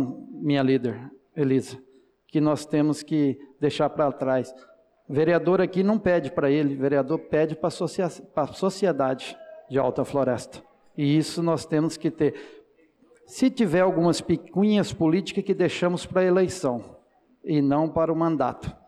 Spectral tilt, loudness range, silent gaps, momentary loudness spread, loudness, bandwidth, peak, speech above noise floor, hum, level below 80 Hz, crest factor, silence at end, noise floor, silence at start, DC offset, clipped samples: -6.5 dB/octave; 3 LU; none; 9 LU; -24 LUFS; 12.5 kHz; -12 dBFS; 36 dB; none; -58 dBFS; 12 dB; 0.15 s; -60 dBFS; 0 s; under 0.1%; under 0.1%